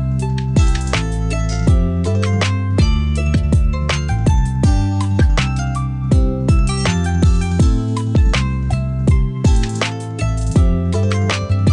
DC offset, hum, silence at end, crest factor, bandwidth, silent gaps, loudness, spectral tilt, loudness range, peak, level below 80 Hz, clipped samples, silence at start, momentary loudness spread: 0.2%; none; 0 s; 14 dB; 10.5 kHz; none; -17 LUFS; -6 dB/octave; 1 LU; 0 dBFS; -20 dBFS; under 0.1%; 0 s; 4 LU